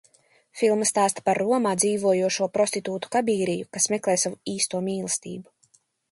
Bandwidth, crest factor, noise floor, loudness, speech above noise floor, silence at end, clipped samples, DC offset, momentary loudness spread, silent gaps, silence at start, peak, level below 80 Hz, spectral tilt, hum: 12 kHz; 18 dB; -64 dBFS; -24 LUFS; 40 dB; 0.7 s; under 0.1%; under 0.1%; 7 LU; none; 0.55 s; -6 dBFS; -70 dBFS; -3.5 dB/octave; none